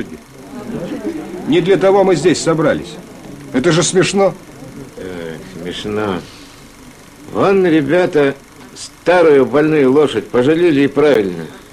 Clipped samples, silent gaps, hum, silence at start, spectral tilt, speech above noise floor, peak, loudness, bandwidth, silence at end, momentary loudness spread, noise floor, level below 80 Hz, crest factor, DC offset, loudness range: under 0.1%; none; none; 0 s; -5 dB/octave; 26 dB; 0 dBFS; -13 LUFS; 14 kHz; 0.1 s; 20 LU; -38 dBFS; -46 dBFS; 14 dB; under 0.1%; 6 LU